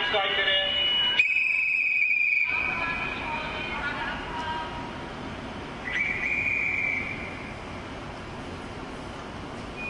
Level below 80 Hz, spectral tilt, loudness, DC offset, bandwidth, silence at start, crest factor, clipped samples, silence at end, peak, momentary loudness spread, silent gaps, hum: -48 dBFS; -3.5 dB/octave; -24 LUFS; under 0.1%; 11.5 kHz; 0 s; 20 dB; under 0.1%; 0 s; -8 dBFS; 17 LU; none; none